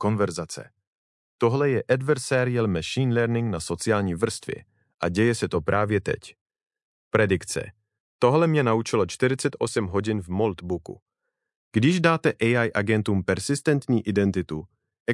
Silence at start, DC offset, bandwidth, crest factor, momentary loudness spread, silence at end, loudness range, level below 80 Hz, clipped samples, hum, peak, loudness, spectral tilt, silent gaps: 0 s; under 0.1%; 12 kHz; 20 dB; 11 LU; 0 s; 3 LU; -58 dBFS; under 0.1%; none; -4 dBFS; -24 LUFS; -6 dB/octave; 0.87-1.39 s, 4.94-4.98 s, 6.41-6.46 s, 6.82-7.11 s, 8.00-8.19 s, 11.02-11.06 s, 11.56-11.71 s, 15.00-15.06 s